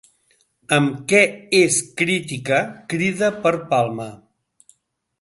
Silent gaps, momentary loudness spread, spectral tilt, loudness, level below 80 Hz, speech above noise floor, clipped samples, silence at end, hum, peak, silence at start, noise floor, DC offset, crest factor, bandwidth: none; 8 LU; -4 dB/octave; -19 LUFS; -62 dBFS; 47 dB; under 0.1%; 1.05 s; none; 0 dBFS; 0.7 s; -66 dBFS; under 0.1%; 20 dB; 12 kHz